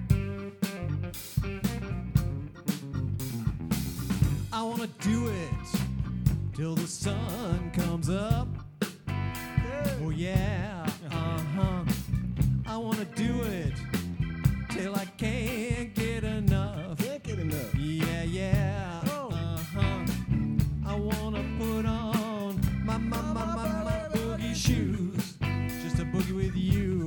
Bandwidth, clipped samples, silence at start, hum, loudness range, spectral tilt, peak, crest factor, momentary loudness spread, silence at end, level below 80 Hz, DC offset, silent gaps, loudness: 19 kHz; under 0.1%; 0 s; none; 1 LU; -6.5 dB/octave; -10 dBFS; 20 dB; 5 LU; 0 s; -40 dBFS; under 0.1%; none; -31 LUFS